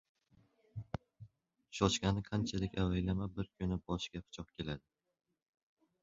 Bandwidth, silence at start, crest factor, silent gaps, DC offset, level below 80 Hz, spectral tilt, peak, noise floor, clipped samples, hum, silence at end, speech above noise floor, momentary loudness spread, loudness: 7.4 kHz; 0.75 s; 24 dB; none; under 0.1%; -54 dBFS; -5.5 dB/octave; -16 dBFS; -71 dBFS; under 0.1%; none; 1.25 s; 34 dB; 14 LU; -38 LUFS